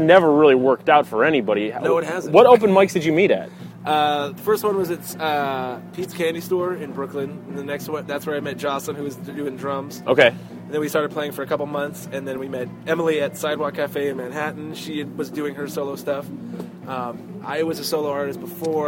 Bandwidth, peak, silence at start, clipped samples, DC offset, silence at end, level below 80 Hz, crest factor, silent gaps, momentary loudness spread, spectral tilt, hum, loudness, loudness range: 16.5 kHz; 0 dBFS; 0 s; under 0.1%; under 0.1%; 0 s; -64 dBFS; 20 dB; none; 15 LU; -5.5 dB/octave; none; -21 LUFS; 10 LU